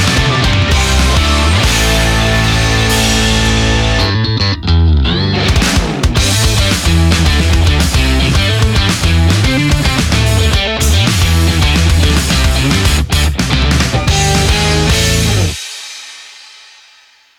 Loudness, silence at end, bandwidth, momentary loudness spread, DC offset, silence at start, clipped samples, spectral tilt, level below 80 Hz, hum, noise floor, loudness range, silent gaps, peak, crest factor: -11 LUFS; 1 s; 17 kHz; 3 LU; under 0.1%; 0 s; under 0.1%; -4 dB/octave; -16 dBFS; none; -46 dBFS; 1 LU; none; 0 dBFS; 10 dB